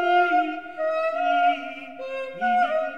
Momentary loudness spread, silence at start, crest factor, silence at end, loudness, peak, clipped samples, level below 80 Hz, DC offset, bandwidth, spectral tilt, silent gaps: 13 LU; 0 s; 14 dB; 0 s; -24 LUFS; -10 dBFS; under 0.1%; -72 dBFS; 0.3%; 6.8 kHz; -4.5 dB/octave; none